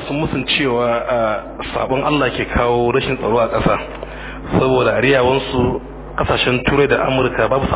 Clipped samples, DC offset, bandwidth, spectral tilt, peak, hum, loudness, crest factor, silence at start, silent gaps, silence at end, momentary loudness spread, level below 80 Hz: under 0.1%; under 0.1%; 4 kHz; -10 dB/octave; 0 dBFS; none; -16 LUFS; 16 dB; 0 s; none; 0 s; 9 LU; -32 dBFS